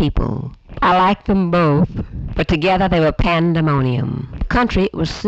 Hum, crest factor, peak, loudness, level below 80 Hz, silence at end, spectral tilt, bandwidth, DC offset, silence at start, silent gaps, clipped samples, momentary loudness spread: none; 10 dB; -6 dBFS; -17 LUFS; -28 dBFS; 0 s; -7.5 dB/octave; 8 kHz; under 0.1%; 0 s; none; under 0.1%; 10 LU